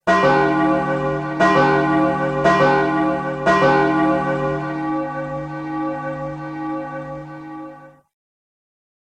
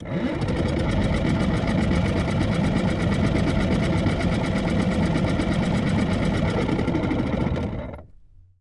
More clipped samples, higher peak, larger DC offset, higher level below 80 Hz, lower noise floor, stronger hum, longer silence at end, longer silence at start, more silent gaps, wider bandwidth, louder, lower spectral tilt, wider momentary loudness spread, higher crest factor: neither; first, -2 dBFS vs -8 dBFS; neither; second, -48 dBFS vs -34 dBFS; second, -40 dBFS vs -49 dBFS; neither; first, 1.2 s vs 0.55 s; about the same, 0.05 s vs 0 s; neither; second, 9.6 kHz vs 11.5 kHz; first, -18 LUFS vs -23 LUFS; about the same, -6.5 dB/octave vs -7 dB/octave; first, 15 LU vs 3 LU; about the same, 18 dB vs 14 dB